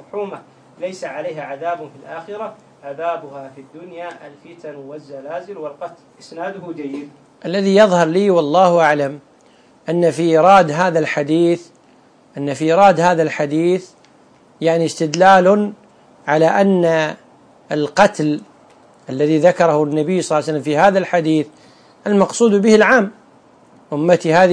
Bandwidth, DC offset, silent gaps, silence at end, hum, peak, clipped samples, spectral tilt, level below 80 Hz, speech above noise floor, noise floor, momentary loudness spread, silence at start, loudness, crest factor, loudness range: 10.5 kHz; under 0.1%; none; 0 s; none; 0 dBFS; under 0.1%; -5.5 dB/octave; -60 dBFS; 34 dB; -50 dBFS; 21 LU; 0.15 s; -15 LUFS; 16 dB; 15 LU